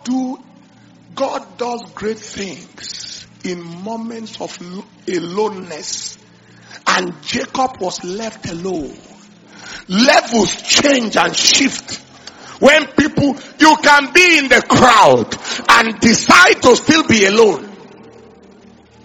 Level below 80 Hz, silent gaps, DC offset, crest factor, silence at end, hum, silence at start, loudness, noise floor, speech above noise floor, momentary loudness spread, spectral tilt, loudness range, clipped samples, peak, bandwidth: -48 dBFS; none; under 0.1%; 16 dB; 1.2 s; none; 0.05 s; -12 LUFS; -45 dBFS; 31 dB; 20 LU; -2.5 dB/octave; 16 LU; 0.4%; 0 dBFS; over 20 kHz